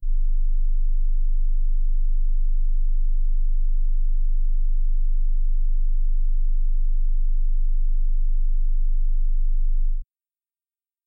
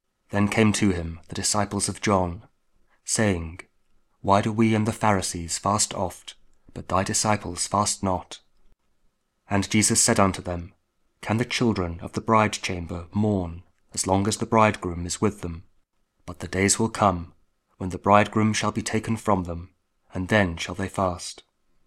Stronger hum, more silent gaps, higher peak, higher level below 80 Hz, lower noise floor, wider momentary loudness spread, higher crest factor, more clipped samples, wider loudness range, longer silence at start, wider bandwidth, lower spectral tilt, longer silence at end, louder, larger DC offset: neither; neither; second, -14 dBFS vs 0 dBFS; first, -18 dBFS vs -48 dBFS; first, under -90 dBFS vs -67 dBFS; second, 0 LU vs 17 LU; second, 4 dB vs 24 dB; neither; second, 0 LU vs 3 LU; second, 0 s vs 0.3 s; second, 0.2 kHz vs 15.5 kHz; first, -13 dB/octave vs -4 dB/octave; first, 1.05 s vs 0.55 s; second, -28 LUFS vs -24 LUFS; neither